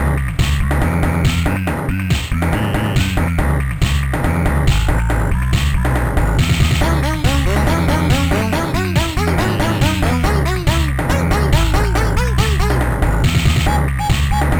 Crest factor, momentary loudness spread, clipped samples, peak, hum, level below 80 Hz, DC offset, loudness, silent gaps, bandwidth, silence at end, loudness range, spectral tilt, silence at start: 14 dB; 3 LU; under 0.1%; 0 dBFS; none; -18 dBFS; under 0.1%; -16 LUFS; none; over 20 kHz; 0 s; 1 LU; -5.5 dB/octave; 0 s